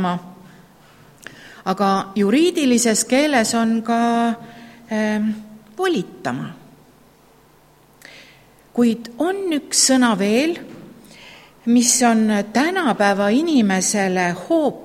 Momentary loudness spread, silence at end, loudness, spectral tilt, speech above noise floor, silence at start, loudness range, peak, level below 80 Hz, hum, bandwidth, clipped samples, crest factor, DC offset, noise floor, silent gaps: 14 LU; 0 s; -18 LUFS; -3.5 dB/octave; 34 dB; 0 s; 9 LU; -2 dBFS; -60 dBFS; none; 16 kHz; under 0.1%; 18 dB; under 0.1%; -52 dBFS; none